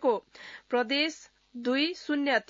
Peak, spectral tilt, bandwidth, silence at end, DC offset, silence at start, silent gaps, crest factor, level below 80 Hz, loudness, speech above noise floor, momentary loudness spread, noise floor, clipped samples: -12 dBFS; -3 dB/octave; 7.8 kHz; 0.1 s; under 0.1%; 0 s; none; 16 dB; -76 dBFS; -29 LUFS; 20 dB; 19 LU; -49 dBFS; under 0.1%